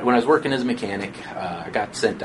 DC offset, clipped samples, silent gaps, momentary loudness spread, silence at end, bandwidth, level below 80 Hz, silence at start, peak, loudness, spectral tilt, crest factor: under 0.1%; under 0.1%; none; 12 LU; 0 s; 11.5 kHz; -56 dBFS; 0 s; -4 dBFS; -23 LUFS; -5 dB/octave; 20 dB